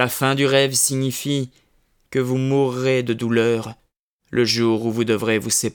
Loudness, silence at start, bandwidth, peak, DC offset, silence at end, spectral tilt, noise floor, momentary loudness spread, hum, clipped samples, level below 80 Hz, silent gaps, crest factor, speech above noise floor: -20 LUFS; 0 s; 19 kHz; -2 dBFS; under 0.1%; 0 s; -4 dB/octave; -67 dBFS; 9 LU; none; under 0.1%; -60 dBFS; 3.99-4.20 s; 18 dB; 48 dB